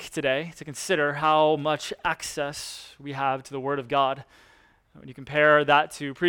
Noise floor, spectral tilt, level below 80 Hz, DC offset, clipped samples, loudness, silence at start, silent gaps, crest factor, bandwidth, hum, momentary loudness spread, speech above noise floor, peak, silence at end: -59 dBFS; -4 dB/octave; -62 dBFS; under 0.1%; under 0.1%; -24 LUFS; 0 s; none; 20 dB; 17.5 kHz; none; 17 LU; 34 dB; -4 dBFS; 0 s